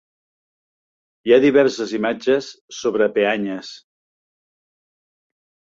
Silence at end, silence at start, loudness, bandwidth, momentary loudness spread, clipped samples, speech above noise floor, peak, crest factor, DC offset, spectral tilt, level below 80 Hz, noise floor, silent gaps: 2 s; 1.25 s; -18 LUFS; 7.6 kHz; 16 LU; under 0.1%; over 72 dB; -2 dBFS; 20 dB; under 0.1%; -5 dB/octave; -64 dBFS; under -90 dBFS; 2.61-2.68 s